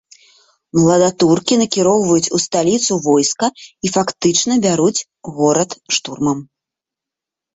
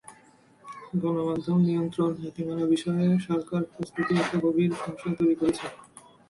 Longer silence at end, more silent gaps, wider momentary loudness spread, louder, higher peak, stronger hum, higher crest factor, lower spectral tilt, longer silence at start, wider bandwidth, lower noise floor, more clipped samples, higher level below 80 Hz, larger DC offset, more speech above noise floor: first, 1.1 s vs 0.45 s; neither; about the same, 7 LU vs 9 LU; first, -15 LUFS vs -27 LUFS; first, -2 dBFS vs -14 dBFS; neither; about the same, 14 dB vs 14 dB; second, -4 dB/octave vs -7.5 dB/octave; first, 0.75 s vs 0.1 s; second, 8.4 kHz vs 11.5 kHz; first, -85 dBFS vs -57 dBFS; neither; first, -54 dBFS vs -64 dBFS; neither; first, 70 dB vs 31 dB